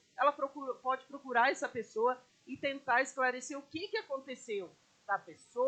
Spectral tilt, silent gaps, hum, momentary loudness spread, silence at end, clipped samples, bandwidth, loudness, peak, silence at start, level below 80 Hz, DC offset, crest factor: -2.5 dB/octave; none; none; 12 LU; 0 s; under 0.1%; 9 kHz; -35 LUFS; -16 dBFS; 0.2 s; -84 dBFS; under 0.1%; 20 dB